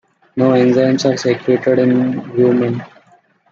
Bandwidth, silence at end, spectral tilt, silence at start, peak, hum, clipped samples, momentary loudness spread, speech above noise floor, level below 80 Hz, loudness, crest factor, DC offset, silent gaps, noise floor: 7.4 kHz; 0.65 s; -6.5 dB/octave; 0.35 s; -2 dBFS; none; under 0.1%; 7 LU; 39 dB; -58 dBFS; -14 LUFS; 14 dB; under 0.1%; none; -52 dBFS